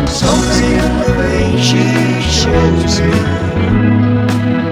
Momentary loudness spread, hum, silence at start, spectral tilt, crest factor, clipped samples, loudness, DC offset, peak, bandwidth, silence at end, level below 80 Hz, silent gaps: 3 LU; none; 0 s; -5.5 dB/octave; 12 dB; under 0.1%; -12 LUFS; under 0.1%; 0 dBFS; 14.5 kHz; 0 s; -22 dBFS; none